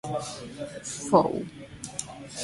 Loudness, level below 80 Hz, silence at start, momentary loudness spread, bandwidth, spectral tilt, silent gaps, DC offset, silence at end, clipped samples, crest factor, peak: -29 LUFS; -58 dBFS; 0.05 s; 16 LU; 11.5 kHz; -4.5 dB/octave; none; under 0.1%; 0 s; under 0.1%; 24 dB; -6 dBFS